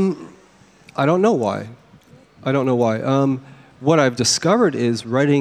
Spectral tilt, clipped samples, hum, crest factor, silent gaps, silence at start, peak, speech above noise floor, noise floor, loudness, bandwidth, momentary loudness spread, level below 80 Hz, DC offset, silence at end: -5 dB/octave; under 0.1%; none; 18 dB; none; 0 s; -2 dBFS; 33 dB; -50 dBFS; -18 LUFS; 14.5 kHz; 13 LU; -62 dBFS; under 0.1%; 0 s